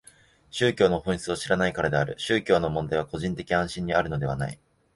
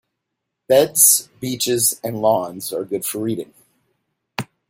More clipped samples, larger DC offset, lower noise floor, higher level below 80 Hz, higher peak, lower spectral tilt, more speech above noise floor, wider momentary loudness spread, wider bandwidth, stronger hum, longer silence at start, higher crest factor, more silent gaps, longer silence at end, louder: neither; neither; second, -56 dBFS vs -79 dBFS; first, -48 dBFS vs -64 dBFS; second, -6 dBFS vs 0 dBFS; first, -5.5 dB/octave vs -2.5 dB/octave; second, 31 dB vs 60 dB; second, 8 LU vs 19 LU; second, 11.5 kHz vs 16.5 kHz; neither; second, 0.55 s vs 0.7 s; about the same, 20 dB vs 20 dB; neither; first, 0.4 s vs 0.25 s; second, -26 LUFS vs -17 LUFS